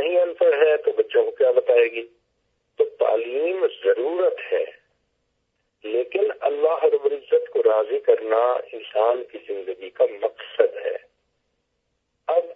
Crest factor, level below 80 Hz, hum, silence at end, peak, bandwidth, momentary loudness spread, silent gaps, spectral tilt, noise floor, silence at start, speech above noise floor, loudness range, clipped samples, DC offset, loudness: 20 dB; -78 dBFS; none; 0 s; -4 dBFS; 3.9 kHz; 12 LU; none; -5.5 dB/octave; -74 dBFS; 0 s; 51 dB; 5 LU; under 0.1%; under 0.1%; -22 LUFS